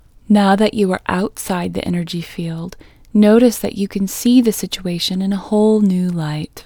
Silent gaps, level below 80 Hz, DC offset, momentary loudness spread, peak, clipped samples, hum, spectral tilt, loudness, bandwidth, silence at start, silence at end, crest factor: none; -46 dBFS; under 0.1%; 12 LU; 0 dBFS; under 0.1%; none; -6 dB/octave; -16 LUFS; over 20 kHz; 0.3 s; 0.05 s; 16 dB